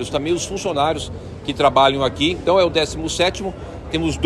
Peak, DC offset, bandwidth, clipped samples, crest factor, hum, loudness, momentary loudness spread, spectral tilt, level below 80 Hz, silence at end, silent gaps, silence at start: -2 dBFS; under 0.1%; 13 kHz; under 0.1%; 18 dB; none; -19 LUFS; 13 LU; -4.5 dB/octave; -38 dBFS; 0 s; none; 0 s